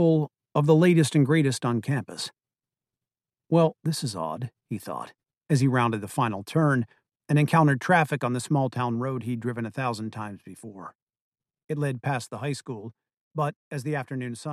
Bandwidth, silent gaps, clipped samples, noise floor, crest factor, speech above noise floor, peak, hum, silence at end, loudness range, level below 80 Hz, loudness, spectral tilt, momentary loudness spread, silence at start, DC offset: 13.5 kHz; 10.95-11.07 s, 11.22-11.32 s, 13.21-13.31 s, 13.56-13.71 s; under 0.1%; under -90 dBFS; 20 dB; over 65 dB; -6 dBFS; none; 0 s; 9 LU; -68 dBFS; -26 LUFS; -6.5 dB/octave; 17 LU; 0 s; under 0.1%